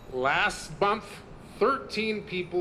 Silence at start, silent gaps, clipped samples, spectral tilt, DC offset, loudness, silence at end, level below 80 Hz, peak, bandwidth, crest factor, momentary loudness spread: 0 s; none; under 0.1%; -4 dB/octave; under 0.1%; -28 LUFS; 0 s; -52 dBFS; -10 dBFS; 14 kHz; 18 dB; 17 LU